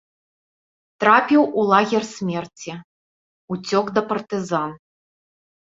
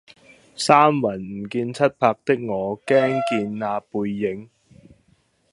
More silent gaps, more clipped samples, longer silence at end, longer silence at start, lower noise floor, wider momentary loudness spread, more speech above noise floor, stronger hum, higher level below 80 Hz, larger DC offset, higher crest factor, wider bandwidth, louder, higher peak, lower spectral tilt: first, 2.84-3.48 s vs none; neither; about the same, 1 s vs 1.05 s; first, 1 s vs 0.6 s; first, under -90 dBFS vs -62 dBFS; first, 17 LU vs 12 LU; first, over 70 dB vs 41 dB; neither; about the same, -66 dBFS vs -62 dBFS; neither; about the same, 20 dB vs 22 dB; second, 7.8 kHz vs 11.5 kHz; about the same, -19 LUFS vs -21 LUFS; about the same, -2 dBFS vs 0 dBFS; about the same, -5.5 dB/octave vs -5.5 dB/octave